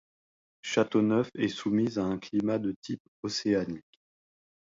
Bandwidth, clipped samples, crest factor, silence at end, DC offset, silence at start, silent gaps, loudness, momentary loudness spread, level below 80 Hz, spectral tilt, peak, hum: 7.8 kHz; under 0.1%; 18 dB; 0.9 s; under 0.1%; 0.65 s; 2.76-2.82 s, 3.00-3.23 s; -30 LUFS; 13 LU; -64 dBFS; -5.5 dB/octave; -12 dBFS; none